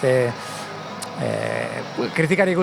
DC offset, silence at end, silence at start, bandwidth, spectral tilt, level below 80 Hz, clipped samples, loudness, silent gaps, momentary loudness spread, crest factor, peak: under 0.1%; 0 s; 0 s; 18.5 kHz; -5.5 dB/octave; -62 dBFS; under 0.1%; -24 LUFS; none; 13 LU; 18 dB; -4 dBFS